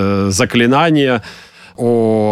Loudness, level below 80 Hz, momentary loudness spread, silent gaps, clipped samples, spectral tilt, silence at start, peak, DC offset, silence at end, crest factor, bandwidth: -13 LUFS; -48 dBFS; 9 LU; none; under 0.1%; -5 dB/octave; 0 s; -2 dBFS; under 0.1%; 0 s; 12 dB; 14.5 kHz